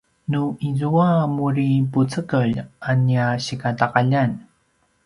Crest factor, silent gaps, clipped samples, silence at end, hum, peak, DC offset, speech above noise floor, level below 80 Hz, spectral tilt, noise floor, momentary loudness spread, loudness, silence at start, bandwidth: 20 dB; none; under 0.1%; 0.65 s; none; -2 dBFS; under 0.1%; 45 dB; -54 dBFS; -7.5 dB/octave; -64 dBFS; 6 LU; -21 LUFS; 0.3 s; 11 kHz